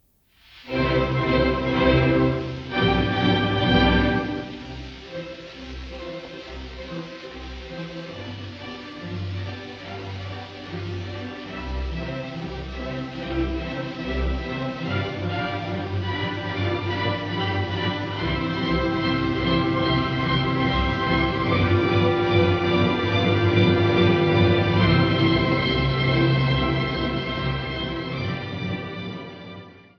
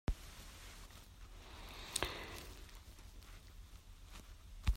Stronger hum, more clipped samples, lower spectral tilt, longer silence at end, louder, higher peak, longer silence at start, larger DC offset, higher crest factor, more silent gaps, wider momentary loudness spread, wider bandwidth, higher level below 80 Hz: neither; neither; first, -7.5 dB/octave vs -3.5 dB/octave; first, 0.15 s vs 0 s; first, -23 LUFS vs -49 LUFS; first, -6 dBFS vs -18 dBFS; first, 0.55 s vs 0.1 s; neither; second, 16 dB vs 30 dB; neither; about the same, 17 LU vs 17 LU; second, 6.8 kHz vs 16 kHz; first, -36 dBFS vs -48 dBFS